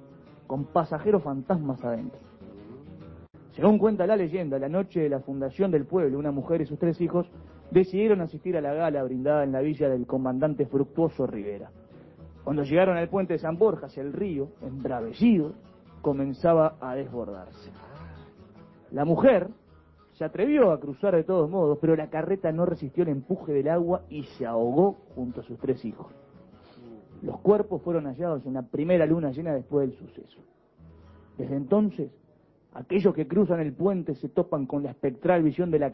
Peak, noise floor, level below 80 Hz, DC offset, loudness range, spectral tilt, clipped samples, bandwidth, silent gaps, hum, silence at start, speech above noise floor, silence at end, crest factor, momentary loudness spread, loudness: -8 dBFS; -61 dBFS; -56 dBFS; under 0.1%; 5 LU; -11 dB/octave; under 0.1%; 5.8 kHz; none; none; 0.5 s; 35 dB; 0 s; 20 dB; 15 LU; -26 LUFS